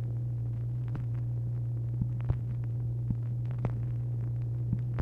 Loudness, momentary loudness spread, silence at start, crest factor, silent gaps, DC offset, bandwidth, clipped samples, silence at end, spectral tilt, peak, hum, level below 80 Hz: -34 LUFS; 1 LU; 0 s; 16 dB; none; under 0.1%; 2.7 kHz; under 0.1%; 0 s; -11 dB/octave; -16 dBFS; none; -46 dBFS